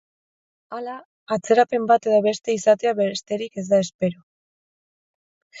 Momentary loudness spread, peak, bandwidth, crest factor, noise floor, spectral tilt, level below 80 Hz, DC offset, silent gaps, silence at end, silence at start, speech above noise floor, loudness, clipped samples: 15 LU; -4 dBFS; 8 kHz; 18 dB; under -90 dBFS; -5 dB/octave; -70 dBFS; under 0.1%; 1.05-1.27 s, 3.94-3.99 s, 4.23-5.50 s; 0 s; 0.7 s; over 69 dB; -21 LUFS; under 0.1%